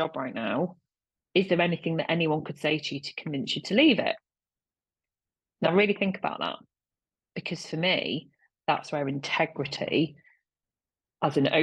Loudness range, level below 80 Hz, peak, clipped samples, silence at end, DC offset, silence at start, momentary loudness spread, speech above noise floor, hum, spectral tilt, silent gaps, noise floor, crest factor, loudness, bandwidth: 4 LU; -72 dBFS; -8 dBFS; under 0.1%; 0 s; under 0.1%; 0 s; 11 LU; over 63 dB; none; -5.5 dB/octave; none; under -90 dBFS; 20 dB; -28 LUFS; 10 kHz